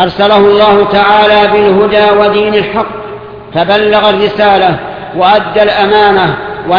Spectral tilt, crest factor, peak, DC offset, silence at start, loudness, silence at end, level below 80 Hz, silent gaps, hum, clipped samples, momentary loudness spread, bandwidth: -7 dB/octave; 8 dB; 0 dBFS; under 0.1%; 0 s; -7 LUFS; 0 s; -38 dBFS; none; none; 0.4%; 12 LU; 5.4 kHz